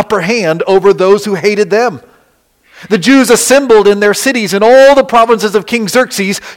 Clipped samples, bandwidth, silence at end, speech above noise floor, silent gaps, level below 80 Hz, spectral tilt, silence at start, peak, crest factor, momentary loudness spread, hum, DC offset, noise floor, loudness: 0.4%; 17 kHz; 0 s; 44 dB; none; -46 dBFS; -4 dB/octave; 0 s; 0 dBFS; 8 dB; 7 LU; none; under 0.1%; -52 dBFS; -8 LUFS